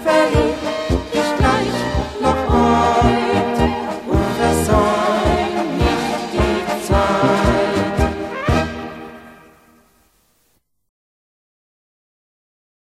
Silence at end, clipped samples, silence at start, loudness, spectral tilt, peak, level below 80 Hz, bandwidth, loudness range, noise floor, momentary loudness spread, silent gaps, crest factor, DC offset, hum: 3.45 s; under 0.1%; 0 s; -17 LUFS; -6 dB/octave; -2 dBFS; -28 dBFS; 15 kHz; 8 LU; -64 dBFS; 6 LU; none; 16 dB; under 0.1%; none